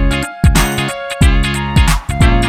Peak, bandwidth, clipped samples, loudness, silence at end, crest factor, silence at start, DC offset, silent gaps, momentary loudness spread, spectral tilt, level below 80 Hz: 0 dBFS; 16 kHz; under 0.1%; -14 LUFS; 0 s; 12 dB; 0 s; under 0.1%; none; 5 LU; -5 dB/octave; -14 dBFS